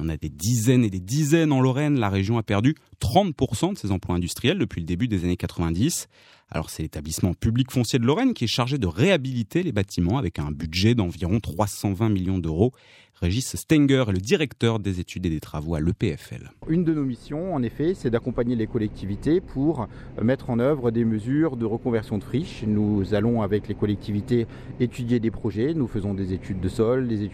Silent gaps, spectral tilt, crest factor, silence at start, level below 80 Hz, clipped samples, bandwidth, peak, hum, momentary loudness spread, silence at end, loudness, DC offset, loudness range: none; -6 dB/octave; 18 dB; 0 s; -46 dBFS; under 0.1%; 16.5 kHz; -4 dBFS; none; 8 LU; 0 s; -24 LUFS; under 0.1%; 4 LU